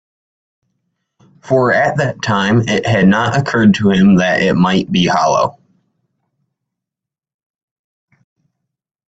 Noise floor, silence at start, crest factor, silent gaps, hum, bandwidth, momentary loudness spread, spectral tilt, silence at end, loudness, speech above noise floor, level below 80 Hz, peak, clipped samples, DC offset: -86 dBFS; 1.45 s; 16 dB; none; none; 8 kHz; 6 LU; -6 dB/octave; 3.6 s; -13 LUFS; 73 dB; -48 dBFS; 0 dBFS; under 0.1%; under 0.1%